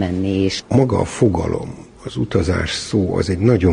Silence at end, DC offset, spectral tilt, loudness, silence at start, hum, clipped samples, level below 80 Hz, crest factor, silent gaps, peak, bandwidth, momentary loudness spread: 0 s; under 0.1%; -6.5 dB/octave; -18 LUFS; 0 s; none; under 0.1%; -32 dBFS; 16 dB; none; -2 dBFS; 10.5 kHz; 10 LU